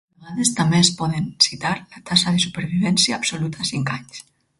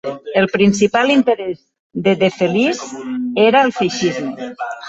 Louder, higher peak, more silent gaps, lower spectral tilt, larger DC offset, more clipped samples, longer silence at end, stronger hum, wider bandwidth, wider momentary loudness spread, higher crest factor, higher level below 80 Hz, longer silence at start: second, -19 LUFS vs -16 LUFS; about the same, 0 dBFS vs -2 dBFS; second, none vs 1.79-1.90 s; second, -3.5 dB/octave vs -5 dB/octave; neither; neither; first, 0.4 s vs 0 s; neither; first, 12 kHz vs 8 kHz; about the same, 12 LU vs 13 LU; first, 20 dB vs 14 dB; about the same, -54 dBFS vs -54 dBFS; first, 0.2 s vs 0.05 s